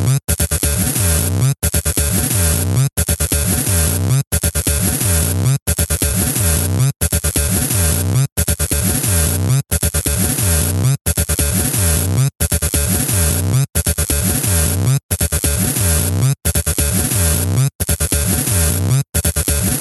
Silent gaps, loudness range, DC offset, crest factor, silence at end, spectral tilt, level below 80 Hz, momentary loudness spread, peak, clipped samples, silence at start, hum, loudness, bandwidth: 4.27-4.31 s, 5.62-5.66 s, 6.96-7.00 s, 8.32-8.36 s, 11.01-11.05 s, 15.03-15.09 s, 17.75-17.79 s, 19.09-19.13 s; 0 LU; under 0.1%; 14 dB; 0 s; -4 dB/octave; -26 dBFS; 2 LU; 0 dBFS; under 0.1%; 0 s; none; -15 LUFS; 16.5 kHz